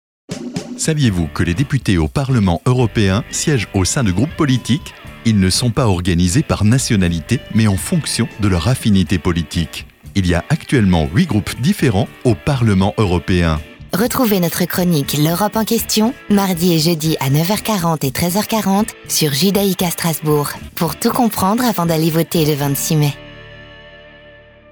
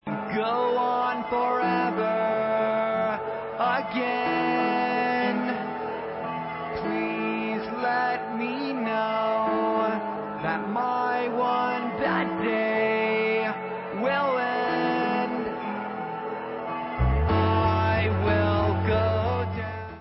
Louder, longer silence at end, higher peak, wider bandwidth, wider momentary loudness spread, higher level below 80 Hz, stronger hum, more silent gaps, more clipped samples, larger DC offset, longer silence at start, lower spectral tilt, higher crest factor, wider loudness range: first, -16 LUFS vs -26 LUFS; first, 0.65 s vs 0 s; first, -2 dBFS vs -10 dBFS; first, over 20 kHz vs 5.8 kHz; about the same, 6 LU vs 8 LU; first, -34 dBFS vs -40 dBFS; neither; neither; neither; neither; first, 0.3 s vs 0.05 s; second, -5 dB/octave vs -11 dB/octave; about the same, 14 dB vs 16 dB; about the same, 1 LU vs 3 LU